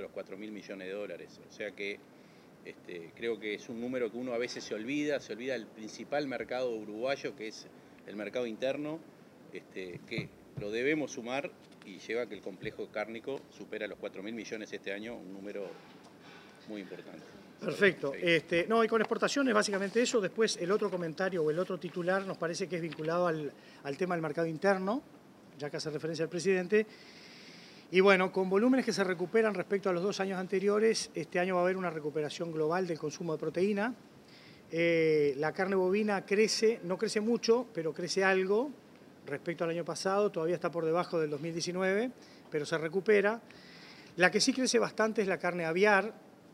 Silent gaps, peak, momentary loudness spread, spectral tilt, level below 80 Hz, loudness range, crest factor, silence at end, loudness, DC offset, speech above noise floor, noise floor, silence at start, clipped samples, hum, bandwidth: none; -8 dBFS; 17 LU; -4.5 dB/octave; -78 dBFS; 10 LU; 24 dB; 0.25 s; -32 LUFS; under 0.1%; 23 dB; -55 dBFS; 0 s; under 0.1%; none; 15 kHz